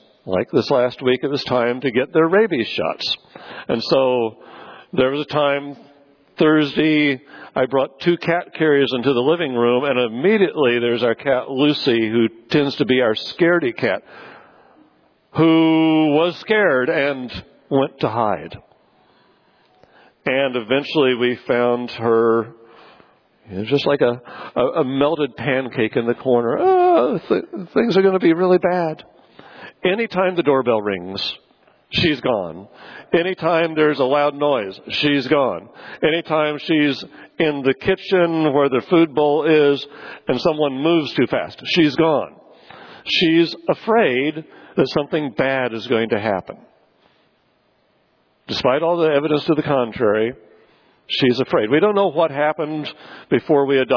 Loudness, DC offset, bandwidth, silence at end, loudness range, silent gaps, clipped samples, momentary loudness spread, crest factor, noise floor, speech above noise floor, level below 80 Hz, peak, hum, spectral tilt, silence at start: -18 LUFS; under 0.1%; 5.4 kHz; 0 s; 4 LU; none; under 0.1%; 10 LU; 16 dB; -61 dBFS; 44 dB; -58 dBFS; -4 dBFS; none; -7 dB/octave; 0.25 s